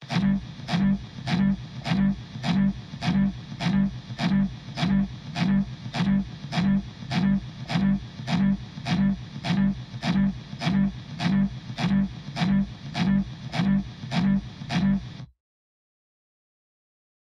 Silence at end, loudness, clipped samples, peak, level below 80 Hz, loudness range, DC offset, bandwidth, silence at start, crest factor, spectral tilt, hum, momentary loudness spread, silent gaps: 2.1 s; -26 LUFS; under 0.1%; -12 dBFS; -44 dBFS; 1 LU; under 0.1%; 7.6 kHz; 0 s; 14 dB; -7 dB/octave; none; 6 LU; none